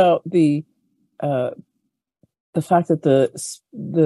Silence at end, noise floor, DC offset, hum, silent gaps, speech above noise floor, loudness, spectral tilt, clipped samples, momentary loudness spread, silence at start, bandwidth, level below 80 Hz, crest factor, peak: 0 s; -75 dBFS; under 0.1%; none; 2.40-2.53 s; 56 dB; -20 LUFS; -6.5 dB/octave; under 0.1%; 12 LU; 0 s; 12.5 kHz; -66 dBFS; 18 dB; -2 dBFS